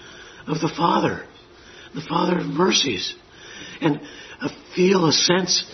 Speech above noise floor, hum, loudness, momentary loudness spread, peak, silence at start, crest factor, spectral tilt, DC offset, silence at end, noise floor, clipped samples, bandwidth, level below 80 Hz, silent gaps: 24 dB; none; -21 LUFS; 21 LU; -2 dBFS; 0 s; 20 dB; -3.5 dB/octave; under 0.1%; 0 s; -46 dBFS; under 0.1%; 6.4 kHz; -58 dBFS; none